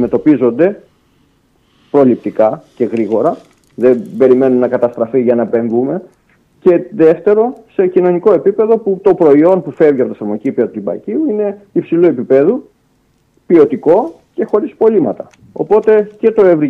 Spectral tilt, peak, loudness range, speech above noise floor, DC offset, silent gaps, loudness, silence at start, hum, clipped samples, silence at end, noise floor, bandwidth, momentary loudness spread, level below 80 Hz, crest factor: -9.5 dB/octave; 0 dBFS; 4 LU; 44 dB; under 0.1%; none; -12 LUFS; 0 s; none; under 0.1%; 0 s; -56 dBFS; 5 kHz; 9 LU; -56 dBFS; 12 dB